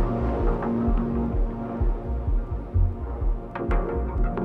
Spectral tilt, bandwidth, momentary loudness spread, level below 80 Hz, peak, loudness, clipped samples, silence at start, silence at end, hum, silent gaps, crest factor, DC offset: -10.5 dB/octave; 3.5 kHz; 5 LU; -26 dBFS; -12 dBFS; -27 LUFS; under 0.1%; 0 s; 0 s; none; none; 12 dB; under 0.1%